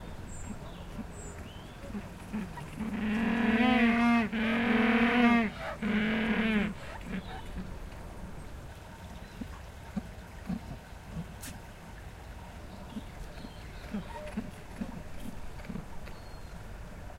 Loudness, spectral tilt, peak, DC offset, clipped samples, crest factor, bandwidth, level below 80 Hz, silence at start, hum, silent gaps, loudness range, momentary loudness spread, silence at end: -31 LUFS; -6 dB/octave; -12 dBFS; under 0.1%; under 0.1%; 22 dB; 15.5 kHz; -48 dBFS; 0 s; none; none; 17 LU; 21 LU; 0 s